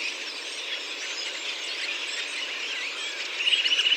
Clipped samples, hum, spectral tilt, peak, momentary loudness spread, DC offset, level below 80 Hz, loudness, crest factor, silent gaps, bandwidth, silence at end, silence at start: under 0.1%; none; 3.5 dB/octave; -10 dBFS; 9 LU; under 0.1%; under -90 dBFS; -27 LUFS; 20 dB; none; 16 kHz; 0 s; 0 s